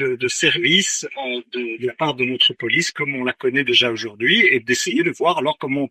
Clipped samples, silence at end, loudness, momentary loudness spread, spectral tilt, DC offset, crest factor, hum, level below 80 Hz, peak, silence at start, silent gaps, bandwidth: under 0.1%; 0.05 s; -18 LUFS; 11 LU; -2.5 dB/octave; under 0.1%; 18 dB; none; -66 dBFS; -2 dBFS; 0 s; none; 14.5 kHz